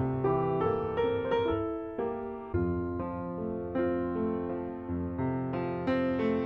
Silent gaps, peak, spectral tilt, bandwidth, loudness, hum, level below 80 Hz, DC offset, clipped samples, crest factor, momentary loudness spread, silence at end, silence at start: none; -18 dBFS; -10 dB/octave; 5.8 kHz; -32 LUFS; none; -52 dBFS; under 0.1%; under 0.1%; 14 dB; 7 LU; 0 s; 0 s